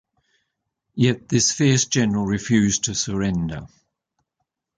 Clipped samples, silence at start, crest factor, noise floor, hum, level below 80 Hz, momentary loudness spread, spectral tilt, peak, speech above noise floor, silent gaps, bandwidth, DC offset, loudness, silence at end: under 0.1%; 0.95 s; 18 dB; -79 dBFS; none; -48 dBFS; 9 LU; -4 dB/octave; -6 dBFS; 58 dB; none; 10 kHz; under 0.1%; -20 LUFS; 1.1 s